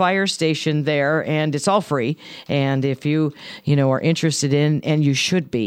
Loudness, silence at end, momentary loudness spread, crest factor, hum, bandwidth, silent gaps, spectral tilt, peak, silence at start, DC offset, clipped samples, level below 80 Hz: -20 LUFS; 0 s; 5 LU; 14 dB; none; 14 kHz; none; -5.5 dB/octave; -6 dBFS; 0 s; under 0.1%; under 0.1%; -62 dBFS